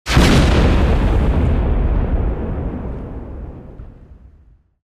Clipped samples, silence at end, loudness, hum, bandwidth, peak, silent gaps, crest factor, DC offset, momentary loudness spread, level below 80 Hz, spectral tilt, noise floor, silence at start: under 0.1%; 0.85 s; -17 LUFS; none; 14.5 kHz; 0 dBFS; none; 16 dB; under 0.1%; 20 LU; -20 dBFS; -6 dB/octave; -49 dBFS; 0.05 s